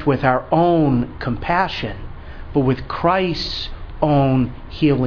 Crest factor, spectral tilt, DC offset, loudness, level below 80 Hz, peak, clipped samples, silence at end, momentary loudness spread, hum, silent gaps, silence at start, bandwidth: 18 dB; -8 dB/octave; under 0.1%; -19 LUFS; -34 dBFS; 0 dBFS; under 0.1%; 0 s; 12 LU; none; none; 0 s; 5.4 kHz